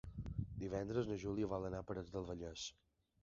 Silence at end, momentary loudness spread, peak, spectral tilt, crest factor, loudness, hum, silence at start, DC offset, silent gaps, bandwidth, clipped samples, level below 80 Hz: 0.5 s; 7 LU; -26 dBFS; -6.5 dB/octave; 18 dB; -45 LUFS; none; 0.05 s; under 0.1%; none; 7.4 kHz; under 0.1%; -58 dBFS